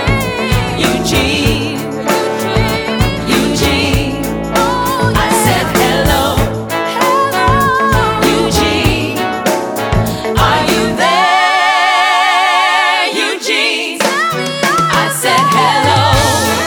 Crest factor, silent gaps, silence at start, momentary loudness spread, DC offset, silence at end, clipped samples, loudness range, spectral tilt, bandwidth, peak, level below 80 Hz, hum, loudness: 12 dB; none; 0 s; 6 LU; under 0.1%; 0 s; under 0.1%; 3 LU; -4 dB/octave; over 20 kHz; 0 dBFS; -26 dBFS; none; -12 LUFS